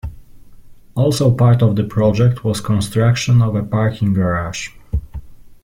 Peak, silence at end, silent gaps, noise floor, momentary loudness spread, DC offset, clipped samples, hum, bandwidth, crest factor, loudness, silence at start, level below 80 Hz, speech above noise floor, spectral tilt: -2 dBFS; 0.1 s; none; -39 dBFS; 14 LU; under 0.1%; under 0.1%; none; 14.5 kHz; 14 dB; -16 LUFS; 0.05 s; -36 dBFS; 24 dB; -7 dB/octave